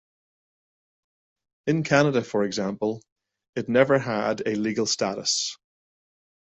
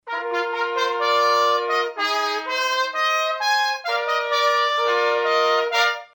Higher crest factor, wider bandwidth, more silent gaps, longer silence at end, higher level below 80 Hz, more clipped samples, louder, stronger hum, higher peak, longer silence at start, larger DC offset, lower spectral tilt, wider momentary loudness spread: first, 22 dB vs 14 dB; second, 8.4 kHz vs 17 kHz; first, 3.12-3.16 s, 3.49-3.53 s vs none; first, 0.95 s vs 0.1 s; first, -64 dBFS vs -78 dBFS; neither; second, -24 LUFS vs -20 LUFS; neither; about the same, -6 dBFS vs -6 dBFS; first, 1.65 s vs 0.05 s; neither; first, -4 dB/octave vs 0.5 dB/octave; first, 11 LU vs 5 LU